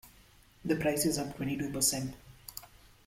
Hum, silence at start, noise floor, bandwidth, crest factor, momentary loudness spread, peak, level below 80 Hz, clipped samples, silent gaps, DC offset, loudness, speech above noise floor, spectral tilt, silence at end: none; 0.05 s; -60 dBFS; 16.5 kHz; 20 dB; 17 LU; -16 dBFS; -58 dBFS; under 0.1%; none; under 0.1%; -32 LUFS; 28 dB; -3.5 dB/octave; 0.4 s